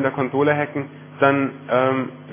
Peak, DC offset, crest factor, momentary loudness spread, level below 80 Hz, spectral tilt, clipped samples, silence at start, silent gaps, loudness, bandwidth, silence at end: -2 dBFS; under 0.1%; 18 dB; 9 LU; -66 dBFS; -10.5 dB/octave; under 0.1%; 0 s; none; -20 LUFS; 3.6 kHz; 0 s